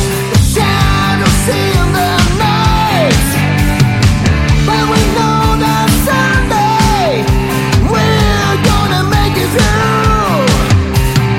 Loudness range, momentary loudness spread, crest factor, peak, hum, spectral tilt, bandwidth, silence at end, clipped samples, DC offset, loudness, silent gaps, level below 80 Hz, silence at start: 0 LU; 2 LU; 10 dB; 0 dBFS; none; -5 dB/octave; 16.5 kHz; 0 s; under 0.1%; under 0.1%; -11 LUFS; none; -18 dBFS; 0 s